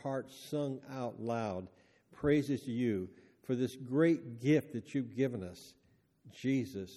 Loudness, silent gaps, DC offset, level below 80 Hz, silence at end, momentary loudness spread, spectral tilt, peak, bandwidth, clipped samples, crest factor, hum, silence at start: -35 LUFS; none; under 0.1%; -68 dBFS; 0 s; 13 LU; -7 dB/octave; -16 dBFS; 13.5 kHz; under 0.1%; 20 dB; none; 0.05 s